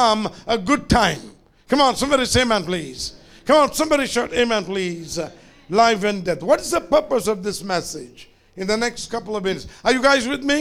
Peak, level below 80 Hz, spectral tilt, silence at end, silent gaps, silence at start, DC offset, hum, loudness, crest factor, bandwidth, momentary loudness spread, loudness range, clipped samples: -2 dBFS; -42 dBFS; -3.5 dB/octave; 0 s; none; 0 s; under 0.1%; none; -20 LUFS; 18 dB; 16 kHz; 12 LU; 3 LU; under 0.1%